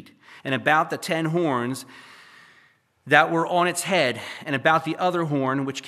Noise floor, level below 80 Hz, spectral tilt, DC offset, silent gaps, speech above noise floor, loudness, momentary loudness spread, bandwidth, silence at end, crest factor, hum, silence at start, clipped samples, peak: -60 dBFS; -76 dBFS; -4.5 dB/octave; under 0.1%; none; 37 dB; -22 LUFS; 11 LU; 15 kHz; 0 s; 24 dB; none; 0.3 s; under 0.1%; 0 dBFS